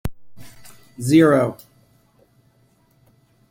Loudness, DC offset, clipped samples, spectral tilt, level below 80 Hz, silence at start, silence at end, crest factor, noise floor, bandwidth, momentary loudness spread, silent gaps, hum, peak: -17 LUFS; under 0.1%; under 0.1%; -6.5 dB/octave; -48 dBFS; 0.05 s; 1.95 s; 20 dB; -59 dBFS; 16.5 kHz; 21 LU; none; none; -2 dBFS